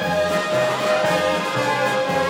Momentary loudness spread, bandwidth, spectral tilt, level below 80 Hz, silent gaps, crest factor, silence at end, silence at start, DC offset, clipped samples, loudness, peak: 2 LU; 17 kHz; -4 dB/octave; -58 dBFS; none; 12 dB; 0 s; 0 s; under 0.1%; under 0.1%; -20 LUFS; -8 dBFS